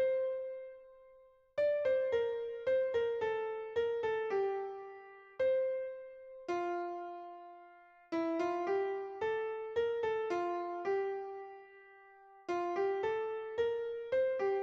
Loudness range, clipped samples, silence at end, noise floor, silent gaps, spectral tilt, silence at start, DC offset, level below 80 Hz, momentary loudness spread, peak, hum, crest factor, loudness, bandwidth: 4 LU; under 0.1%; 0 s; -63 dBFS; none; -5.5 dB/octave; 0 s; under 0.1%; -74 dBFS; 17 LU; -24 dBFS; none; 14 dB; -36 LUFS; 7.2 kHz